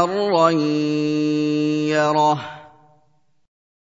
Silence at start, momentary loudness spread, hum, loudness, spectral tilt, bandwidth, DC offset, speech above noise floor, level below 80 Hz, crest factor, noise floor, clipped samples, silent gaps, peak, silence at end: 0 s; 4 LU; none; -19 LUFS; -6 dB/octave; 7.8 kHz; under 0.1%; 45 dB; -72 dBFS; 18 dB; -64 dBFS; under 0.1%; none; -2 dBFS; 1.3 s